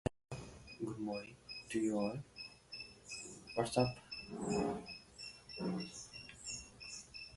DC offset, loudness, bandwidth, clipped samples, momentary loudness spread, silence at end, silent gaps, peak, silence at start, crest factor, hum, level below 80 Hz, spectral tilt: under 0.1%; -43 LUFS; 11.5 kHz; under 0.1%; 14 LU; 0 s; none; -18 dBFS; 0.05 s; 24 dB; none; -64 dBFS; -5 dB/octave